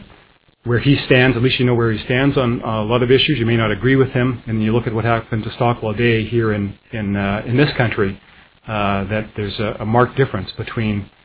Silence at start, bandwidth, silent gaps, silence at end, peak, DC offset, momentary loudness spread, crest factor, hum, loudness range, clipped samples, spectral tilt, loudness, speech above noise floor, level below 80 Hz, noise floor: 0 s; 4 kHz; none; 0.2 s; 0 dBFS; under 0.1%; 9 LU; 18 dB; none; 5 LU; under 0.1%; -10.5 dB/octave; -17 LUFS; 35 dB; -40 dBFS; -52 dBFS